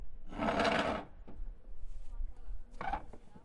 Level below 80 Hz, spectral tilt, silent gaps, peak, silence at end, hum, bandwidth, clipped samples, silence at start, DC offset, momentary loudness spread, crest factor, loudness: -46 dBFS; -5 dB/octave; none; -20 dBFS; 0 s; none; 11 kHz; under 0.1%; 0 s; under 0.1%; 22 LU; 18 dB; -36 LUFS